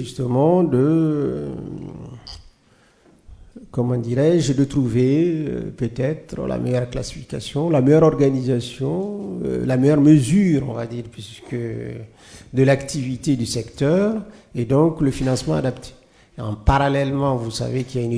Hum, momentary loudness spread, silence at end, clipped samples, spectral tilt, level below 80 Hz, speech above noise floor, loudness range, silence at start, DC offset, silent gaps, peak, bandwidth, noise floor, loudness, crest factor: none; 16 LU; 0 s; under 0.1%; -7 dB/octave; -40 dBFS; 37 dB; 5 LU; 0 s; under 0.1%; none; -2 dBFS; 11 kHz; -56 dBFS; -20 LUFS; 18 dB